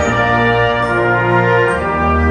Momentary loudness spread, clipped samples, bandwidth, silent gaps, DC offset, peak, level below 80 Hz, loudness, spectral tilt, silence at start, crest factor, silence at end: 2 LU; under 0.1%; 9.4 kHz; none; under 0.1%; -2 dBFS; -28 dBFS; -13 LUFS; -6.5 dB/octave; 0 s; 12 dB; 0 s